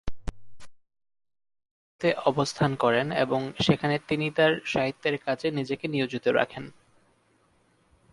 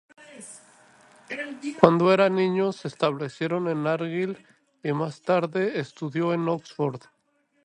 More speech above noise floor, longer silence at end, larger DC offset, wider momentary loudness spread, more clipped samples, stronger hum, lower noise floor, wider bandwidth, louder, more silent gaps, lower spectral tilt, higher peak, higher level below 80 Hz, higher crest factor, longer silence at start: second, 40 dB vs 45 dB; first, 1.45 s vs 0.65 s; neither; second, 8 LU vs 17 LU; neither; neither; about the same, -66 dBFS vs -69 dBFS; about the same, 11.5 kHz vs 11.5 kHz; about the same, -26 LUFS vs -25 LUFS; first, 1.71-1.99 s vs none; about the same, -5.5 dB/octave vs -6.5 dB/octave; second, -8 dBFS vs 0 dBFS; first, -50 dBFS vs -68 dBFS; second, 20 dB vs 26 dB; second, 0.05 s vs 0.2 s